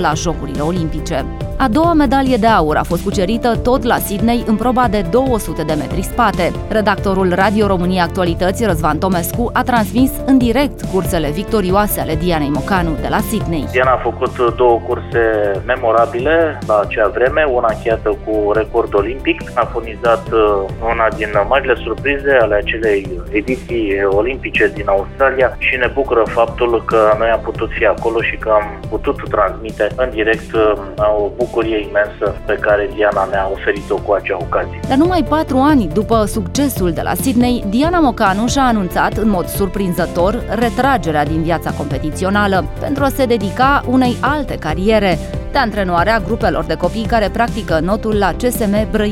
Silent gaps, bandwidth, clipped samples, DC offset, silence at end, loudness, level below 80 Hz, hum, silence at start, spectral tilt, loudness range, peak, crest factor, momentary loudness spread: none; 17.5 kHz; under 0.1%; under 0.1%; 0 s; -15 LUFS; -28 dBFS; none; 0 s; -6 dB/octave; 2 LU; 0 dBFS; 14 dB; 6 LU